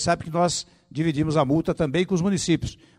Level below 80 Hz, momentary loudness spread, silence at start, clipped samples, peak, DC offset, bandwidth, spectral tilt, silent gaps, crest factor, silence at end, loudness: -46 dBFS; 5 LU; 0 s; under 0.1%; -8 dBFS; under 0.1%; 11 kHz; -5.5 dB/octave; none; 14 dB; 0.25 s; -23 LUFS